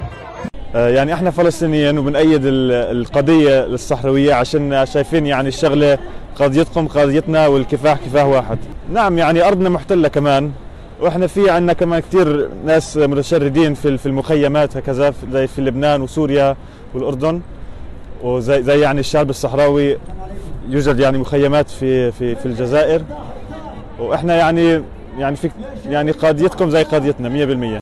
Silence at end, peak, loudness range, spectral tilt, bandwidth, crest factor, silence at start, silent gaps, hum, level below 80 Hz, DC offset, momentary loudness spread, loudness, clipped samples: 0 s; -6 dBFS; 3 LU; -6.5 dB/octave; 12.5 kHz; 10 dB; 0 s; none; none; -34 dBFS; under 0.1%; 13 LU; -15 LUFS; under 0.1%